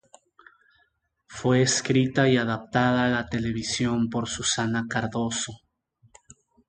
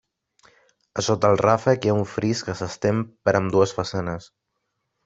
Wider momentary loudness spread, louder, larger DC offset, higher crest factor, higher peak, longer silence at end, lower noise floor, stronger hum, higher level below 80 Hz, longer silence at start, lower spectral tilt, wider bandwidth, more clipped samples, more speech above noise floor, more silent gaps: second, 7 LU vs 11 LU; second, -25 LUFS vs -22 LUFS; neither; about the same, 20 dB vs 20 dB; second, -6 dBFS vs -2 dBFS; first, 1.15 s vs 0.8 s; second, -70 dBFS vs -77 dBFS; neither; about the same, -54 dBFS vs -56 dBFS; first, 1.3 s vs 0.95 s; about the same, -4.5 dB/octave vs -5.5 dB/octave; first, 9.6 kHz vs 8 kHz; neither; second, 45 dB vs 55 dB; neither